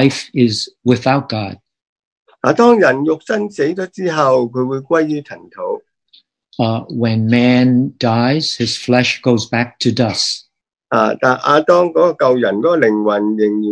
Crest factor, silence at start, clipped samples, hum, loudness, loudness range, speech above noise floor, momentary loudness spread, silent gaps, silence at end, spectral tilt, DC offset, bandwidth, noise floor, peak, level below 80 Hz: 14 dB; 0 s; under 0.1%; none; -15 LUFS; 4 LU; 38 dB; 9 LU; 1.82-1.96 s, 2.05-2.26 s; 0 s; -5.5 dB/octave; under 0.1%; 10.5 kHz; -53 dBFS; 0 dBFS; -58 dBFS